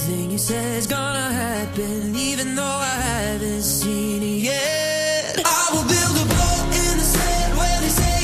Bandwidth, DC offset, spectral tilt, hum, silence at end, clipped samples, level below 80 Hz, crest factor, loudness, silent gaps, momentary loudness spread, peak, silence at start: 14 kHz; under 0.1%; -3.5 dB/octave; none; 0 s; under 0.1%; -28 dBFS; 18 dB; -20 LUFS; none; 5 LU; -2 dBFS; 0 s